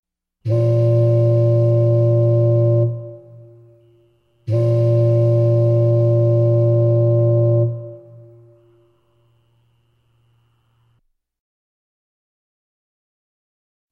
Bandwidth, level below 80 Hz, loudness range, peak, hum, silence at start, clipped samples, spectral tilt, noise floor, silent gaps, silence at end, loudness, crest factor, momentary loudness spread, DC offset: 2.9 kHz; -60 dBFS; 5 LU; -8 dBFS; none; 0.45 s; under 0.1%; -12 dB/octave; -65 dBFS; none; 5.95 s; -16 LUFS; 10 dB; 8 LU; under 0.1%